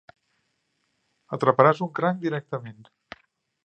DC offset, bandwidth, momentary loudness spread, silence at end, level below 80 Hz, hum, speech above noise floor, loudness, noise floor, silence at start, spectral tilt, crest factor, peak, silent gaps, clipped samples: under 0.1%; 8.8 kHz; 17 LU; 0.95 s; -72 dBFS; none; 50 dB; -23 LUFS; -74 dBFS; 1.3 s; -8 dB/octave; 26 dB; 0 dBFS; none; under 0.1%